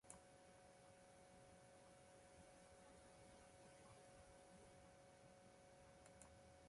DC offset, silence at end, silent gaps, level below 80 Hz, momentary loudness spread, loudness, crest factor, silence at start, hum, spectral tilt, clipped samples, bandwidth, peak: under 0.1%; 0 s; none; -80 dBFS; 2 LU; -67 LUFS; 26 dB; 0.05 s; none; -4 dB/octave; under 0.1%; 11.5 kHz; -40 dBFS